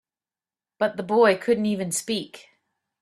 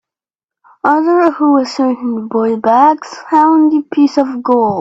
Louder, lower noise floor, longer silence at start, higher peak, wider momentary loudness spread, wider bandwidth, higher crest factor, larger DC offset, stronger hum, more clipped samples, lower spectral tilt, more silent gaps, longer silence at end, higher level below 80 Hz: second, -23 LUFS vs -12 LUFS; about the same, under -90 dBFS vs -87 dBFS; about the same, 0.8 s vs 0.85 s; second, -6 dBFS vs 0 dBFS; first, 10 LU vs 6 LU; first, 13.5 kHz vs 7.8 kHz; first, 18 dB vs 12 dB; neither; neither; neither; second, -4 dB/octave vs -6 dB/octave; neither; first, 0.6 s vs 0 s; second, -68 dBFS vs -60 dBFS